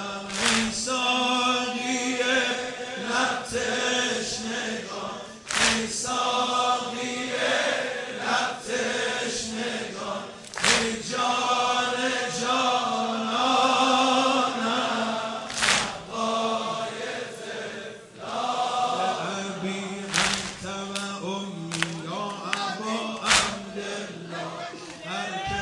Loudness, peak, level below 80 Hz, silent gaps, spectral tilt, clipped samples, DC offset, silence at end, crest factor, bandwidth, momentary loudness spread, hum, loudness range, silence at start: -25 LUFS; -2 dBFS; -58 dBFS; none; -2 dB/octave; under 0.1%; under 0.1%; 0 s; 24 dB; 11.5 kHz; 12 LU; none; 6 LU; 0 s